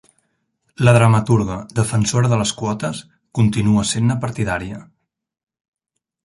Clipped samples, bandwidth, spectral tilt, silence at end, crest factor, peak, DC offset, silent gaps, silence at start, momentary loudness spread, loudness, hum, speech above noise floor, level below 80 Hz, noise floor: under 0.1%; 11.5 kHz; -5.5 dB/octave; 1.4 s; 18 dB; 0 dBFS; under 0.1%; none; 0.8 s; 13 LU; -18 LUFS; none; 63 dB; -44 dBFS; -79 dBFS